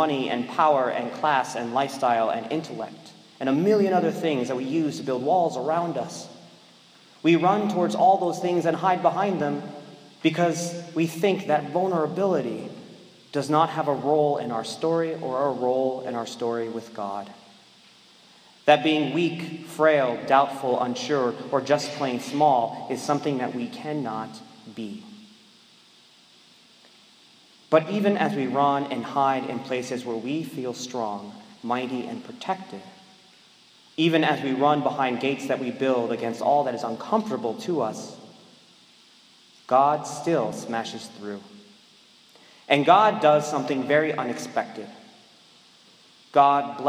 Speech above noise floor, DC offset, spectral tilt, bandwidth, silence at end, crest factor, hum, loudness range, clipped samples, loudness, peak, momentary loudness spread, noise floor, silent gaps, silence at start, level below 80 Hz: 31 dB; under 0.1%; -5.5 dB/octave; 16 kHz; 0 s; 22 dB; none; 8 LU; under 0.1%; -24 LUFS; -2 dBFS; 15 LU; -55 dBFS; none; 0 s; -78 dBFS